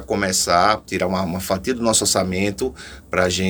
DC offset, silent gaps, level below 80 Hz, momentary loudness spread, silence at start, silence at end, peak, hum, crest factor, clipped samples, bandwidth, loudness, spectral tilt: under 0.1%; none; -44 dBFS; 9 LU; 0 s; 0 s; -2 dBFS; none; 18 dB; under 0.1%; over 20 kHz; -19 LUFS; -3 dB/octave